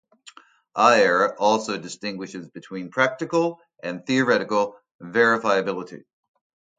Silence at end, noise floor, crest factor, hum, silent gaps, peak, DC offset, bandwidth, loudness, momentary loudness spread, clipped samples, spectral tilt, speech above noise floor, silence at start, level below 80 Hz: 0.8 s; -50 dBFS; 22 dB; none; 4.94-4.99 s; -2 dBFS; under 0.1%; 9.4 kHz; -22 LUFS; 17 LU; under 0.1%; -4.5 dB/octave; 28 dB; 0.25 s; -70 dBFS